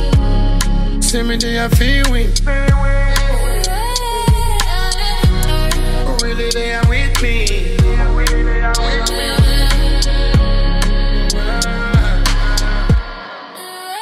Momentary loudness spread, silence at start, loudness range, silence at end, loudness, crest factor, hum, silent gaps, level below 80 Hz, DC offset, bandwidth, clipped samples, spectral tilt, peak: 4 LU; 0 s; 1 LU; 0 s; -16 LUFS; 12 dB; none; none; -14 dBFS; under 0.1%; 15 kHz; under 0.1%; -4.5 dB/octave; 0 dBFS